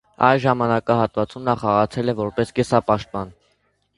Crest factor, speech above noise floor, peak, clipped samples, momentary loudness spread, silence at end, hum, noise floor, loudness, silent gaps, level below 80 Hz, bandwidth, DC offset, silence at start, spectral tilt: 20 dB; 46 dB; 0 dBFS; under 0.1%; 6 LU; 0.65 s; none; -66 dBFS; -20 LUFS; none; -50 dBFS; 11.5 kHz; under 0.1%; 0.2 s; -7 dB/octave